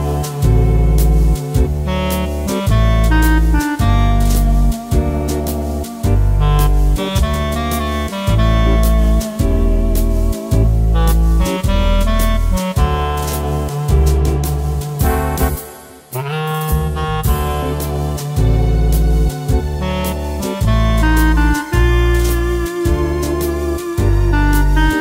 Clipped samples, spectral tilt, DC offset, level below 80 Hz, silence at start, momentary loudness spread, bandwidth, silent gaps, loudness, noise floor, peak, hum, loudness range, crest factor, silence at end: under 0.1%; -6 dB/octave; under 0.1%; -16 dBFS; 0 s; 6 LU; 16.5 kHz; none; -16 LUFS; -35 dBFS; 0 dBFS; none; 3 LU; 12 dB; 0 s